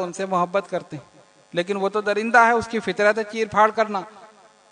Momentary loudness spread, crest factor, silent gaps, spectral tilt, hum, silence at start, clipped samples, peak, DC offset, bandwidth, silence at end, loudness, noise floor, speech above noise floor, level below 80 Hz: 14 LU; 20 dB; none; -4.5 dB/octave; none; 0 s; under 0.1%; -2 dBFS; under 0.1%; 10.5 kHz; 0.45 s; -21 LUFS; -50 dBFS; 29 dB; -64 dBFS